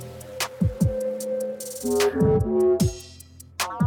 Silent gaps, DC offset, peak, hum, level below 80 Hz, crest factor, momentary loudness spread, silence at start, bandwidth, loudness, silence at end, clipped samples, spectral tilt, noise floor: none; under 0.1%; -8 dBFS; none; -42 dBFS; 16 dB; 18 LU; 0 s; 19 kHz; -24 LUFS; 0 s; under 0.1%; -5.5 dB/octave; -46 dBFS